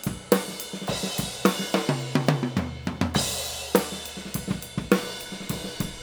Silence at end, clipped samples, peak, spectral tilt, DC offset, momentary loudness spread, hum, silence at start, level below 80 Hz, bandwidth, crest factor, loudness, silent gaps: 0 s; under 0.1%; -2 dBFS; -4.5 dB/octave; under 0.1%; 8 LU; none; 0 s; -48 dBFS; over 20 kHz; 24 dB; -27 LUFS; none